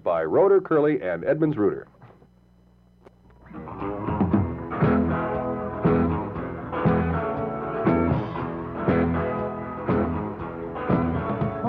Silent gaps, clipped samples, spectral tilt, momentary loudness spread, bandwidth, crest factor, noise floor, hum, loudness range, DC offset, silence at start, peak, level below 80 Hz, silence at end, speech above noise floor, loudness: none; under 0.1%; -11 dB/octave; 10 LU; 5 kHz; 16 dB; -56 dBFS; 60 Hz at -50 dBFS; 5 LU; under 0.1%; 0.05 s; -8 dBFS; -46 dBFS; 0 s; 35 dB; -24 LUFS